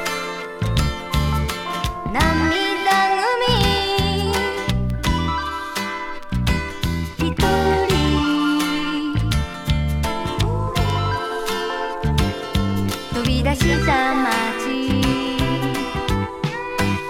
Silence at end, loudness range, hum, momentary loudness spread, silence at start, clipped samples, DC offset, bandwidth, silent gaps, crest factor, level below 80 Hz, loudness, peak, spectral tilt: 0 s; 3 LU; none; 7 LU; 0 s; under 0.1%; under 0.1%; 17.5 kHz; none; 20 dB; -28 dBFS; -20 LUFS; 0 dBFS; -5 dB/octave